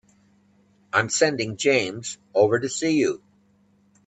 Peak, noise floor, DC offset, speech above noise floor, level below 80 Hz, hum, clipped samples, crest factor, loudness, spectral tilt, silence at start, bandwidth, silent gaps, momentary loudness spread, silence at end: -6 dBFS; -61 dBFS; under 0.1%; 39 dB; -68 dBFS; none; under 0.1%; 20 dB; -23 LUFS; -3.5 dB/octave; 0.95 s; 9.2 kHz; none; 8 LU; 0.9 s